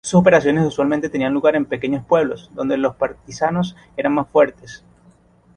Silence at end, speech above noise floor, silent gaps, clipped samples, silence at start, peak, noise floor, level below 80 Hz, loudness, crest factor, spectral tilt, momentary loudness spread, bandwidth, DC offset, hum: 0.8 s; 34 dB; none; under 0.1%; 0.05 s; -2 dBFS; -52 dBFS; -52 dBFS; -18 LUFS; 16 dB; -6.5 dB/octave; 10 LU; 10.5 kHz; under 0.1%; none